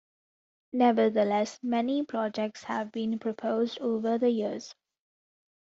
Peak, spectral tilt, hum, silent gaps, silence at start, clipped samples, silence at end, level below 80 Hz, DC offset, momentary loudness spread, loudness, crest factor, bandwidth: -10 dBFS; -4.5 dB/octave; none; none; 0.75 s; under 0.1%; 0.95 s; -76 dBFS; under 0.1%; 9 LU; -29 LUFS; 18 dB; 7.8 kHz